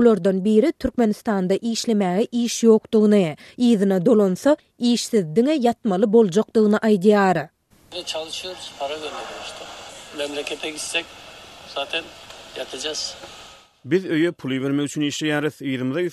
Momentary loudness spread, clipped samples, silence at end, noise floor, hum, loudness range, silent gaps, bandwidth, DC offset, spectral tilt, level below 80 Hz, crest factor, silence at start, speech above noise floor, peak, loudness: 18 LU; under 0.1%; 0 s; -41 dBFS; none; 11 LU; none; 13.5 kHz; under 0.1%; -5 dB/octave; -56 dBFS; 16 dB; 0 s; 21 dB; -4 dBFS; -21 LUFS